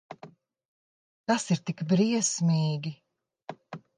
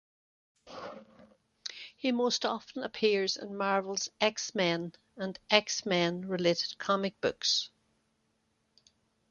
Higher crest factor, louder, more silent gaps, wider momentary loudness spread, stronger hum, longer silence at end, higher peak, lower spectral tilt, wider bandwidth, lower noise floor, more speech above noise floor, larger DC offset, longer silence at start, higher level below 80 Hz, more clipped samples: second, 18 dB vs 28 dB; first, -27 LUFS vs -31 LUFS; first, 0.65-1.24 s vs none; first, 21 LU vs 16 LU; neither; second, 0.2 s vs 1.65 s; second, -12 dBFS vs -6 dBFS; first, -5 dB/octave vs -3 dB/octave; first, 10 kHz vs 7.4 kHz; second, -52 dBFS vs -76 dBFS; second, 26 dB vs 45 dB; neither; second, 0.1 s vs 0.65 s; about the same, -76 dBFS vs -74 dBFS; neither